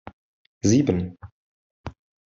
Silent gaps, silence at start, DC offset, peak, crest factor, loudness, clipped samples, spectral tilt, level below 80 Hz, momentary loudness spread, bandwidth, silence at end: 0.13-0.61 s, 1.32-1.84 s; 0.05 s; under 0.1%; -6 dBFS; 20 dB; -23 LUFS; under 0.1%; -6 dB/octave; -54 dBFS; 22 LU; 7.8 kHz; 0.4 s